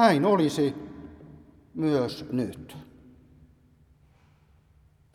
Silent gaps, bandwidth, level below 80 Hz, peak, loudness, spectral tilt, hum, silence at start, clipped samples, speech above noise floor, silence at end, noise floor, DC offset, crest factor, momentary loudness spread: none; 14.5 kHz; -60 dBFS; -6 dBFS; -26 LUFS; -6.5 dB/octave; none; 0 s; under 0.1%; 36 dB; 2.3 s; -60 dBFS; under 0.1%; 24 dB; 24 LU